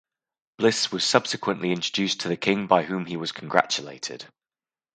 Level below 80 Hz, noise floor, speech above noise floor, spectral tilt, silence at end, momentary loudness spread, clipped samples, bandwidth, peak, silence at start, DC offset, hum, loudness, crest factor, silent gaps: -70 dBFS; under -90 dBFS; over 65 dB; -3.5 dB/octave; 0.65 s; 10 LU; under 0.1%; 9.6 kHz; 0 dBFS; 0.6 s; under 0.1%; none; -24 LUFS; 26 dB; none